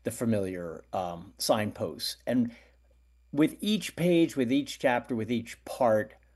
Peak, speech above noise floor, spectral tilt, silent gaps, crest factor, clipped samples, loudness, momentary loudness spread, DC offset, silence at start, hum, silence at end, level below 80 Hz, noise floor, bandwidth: -10 dBFS; 33 dB; -5 dB/octave; none; 18 dB; under 0.1%; -29 LUFS; 9 LU; under 0.1%; 0.05 s; none; 0.25 s; -62 dBFS; -62 dBFS; 12.5 kHz